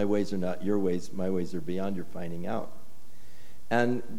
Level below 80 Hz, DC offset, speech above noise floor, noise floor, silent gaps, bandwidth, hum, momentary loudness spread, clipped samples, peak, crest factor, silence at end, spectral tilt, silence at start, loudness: -62 dBFS; 4%; 26 dB; -57 dBFS; none; 17 kHz; none; 10 LU; under 0.1%; -12 dBFS; 20 dB; 0 s; -7 dB/octave; 0 s; -31 LUFS